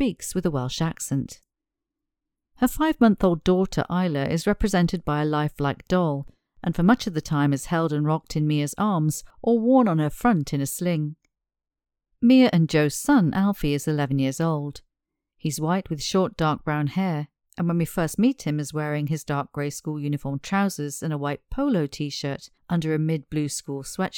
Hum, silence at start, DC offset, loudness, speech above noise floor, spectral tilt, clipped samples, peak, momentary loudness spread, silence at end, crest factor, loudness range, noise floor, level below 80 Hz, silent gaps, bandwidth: none; 0 s; under 0.1%; -24 LUFS; 63 dB; -6 dB/octave; under 0.1%; -4 dBFS; 10 LU; 0 s; 18 dB; 5 LU; -86 dBFS; -46 dBFS; none; 18.5 kHz